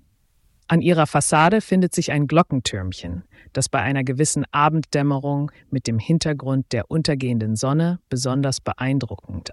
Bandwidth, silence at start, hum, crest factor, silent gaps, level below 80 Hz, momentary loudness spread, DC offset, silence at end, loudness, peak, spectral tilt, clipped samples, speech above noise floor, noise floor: 12 kHz; 0.7 s; none; 16 dB; none; -48 dBFS; 10 LU; under 0.1%; 0 s; -21 LUFS; -4 dBFS; -5.5 dB/octave; under 0.1%; 40 dB; -61 dBFS